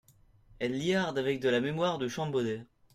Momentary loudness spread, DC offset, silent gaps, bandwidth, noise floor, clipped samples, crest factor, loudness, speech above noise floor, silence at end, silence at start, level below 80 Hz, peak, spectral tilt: 7 LU; under 0.1%; none; 15 kHz; -61 dBFS; under 0.1%; 16 dB; -31 LUFS; 30 dB; 0.3 s; 0.6 s; -64 dBFS; -16 dBFS; -5.5 dB/octave